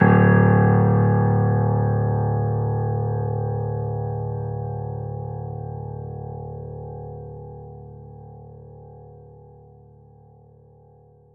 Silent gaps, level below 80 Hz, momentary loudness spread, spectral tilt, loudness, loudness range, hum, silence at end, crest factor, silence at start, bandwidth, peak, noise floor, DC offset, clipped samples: none; -44 dBFS; 25 LU; -13 dB/octave; -22 LUFS; 23 LU; none; 2.1 s; 18 dB; 0 s; 3 kHz; -4 dBFS; -52 dBFS; under 0.1%; under 0.1%